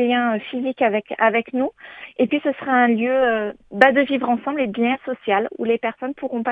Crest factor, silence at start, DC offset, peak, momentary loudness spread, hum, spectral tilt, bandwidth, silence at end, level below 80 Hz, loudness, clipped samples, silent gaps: 20 dB; 0 s; under 0.1%; 0 dBFS; 10 LU; none; -7 dB/octave; 5.6 kHz; 0 s; -64 dBFS; -20 LUFS; under 0.1%; none